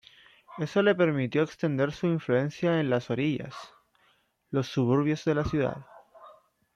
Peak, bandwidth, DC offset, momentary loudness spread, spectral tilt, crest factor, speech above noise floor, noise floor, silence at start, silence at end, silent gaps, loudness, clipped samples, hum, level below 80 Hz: -12 dBFS; 10 kHz; under 0.1%; 10 LU; -7.5 dB/octave; 18 dB; 41 dB; -68 dBFS; 0.5 s; 0.45 s; none; -27 LUFS; under 0.1%; none; -56 dBFS